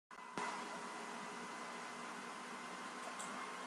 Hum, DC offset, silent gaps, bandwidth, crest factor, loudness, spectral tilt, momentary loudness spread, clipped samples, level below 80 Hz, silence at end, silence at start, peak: none; under 0.1%; none; 13 kHz; 24 dB; -47 LUFS; -2.5 dB/octave; 4 LU; under 0.1%; -88 dBFS; 0 s; 0.1 s; -24 dBFS